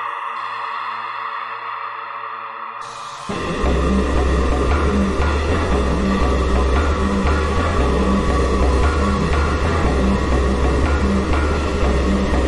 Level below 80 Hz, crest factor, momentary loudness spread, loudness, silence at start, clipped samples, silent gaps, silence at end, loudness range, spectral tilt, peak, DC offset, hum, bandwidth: -22 dBFS; 12 dB; 9 LU; -19 LUFS; 0 s; under 0.1%; none; 0 s; 6 LU; -6.5 dB/octave; -4 dBFS; under 0.1%; none; 11 kHz